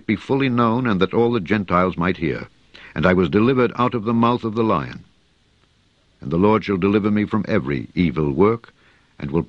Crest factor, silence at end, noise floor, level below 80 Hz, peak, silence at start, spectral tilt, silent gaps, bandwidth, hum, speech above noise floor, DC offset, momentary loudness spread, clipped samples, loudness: 18 dB; 0.05 s; -59 dBFS; -46 dBFS; 0 dBFS; 0.1 s; -8.5 dB/octave; none; 7 kHz; none; 41 dB; under 0.1%; 9 LU; under 0.1%; -19 LUFS